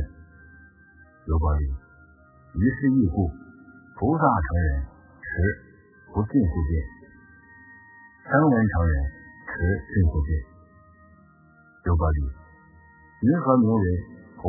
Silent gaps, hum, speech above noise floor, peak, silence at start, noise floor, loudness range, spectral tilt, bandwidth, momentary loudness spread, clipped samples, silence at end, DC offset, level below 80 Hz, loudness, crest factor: none; none; 33 dB; -4 dBFS; 0 s; -55 dBFS; 4 LU; -15 dB/octave; 2.1 kHz; 17 LU; under 0.1%; 0 s; under 0.1%; -32 dBFS; -24 LUFS; 20 dB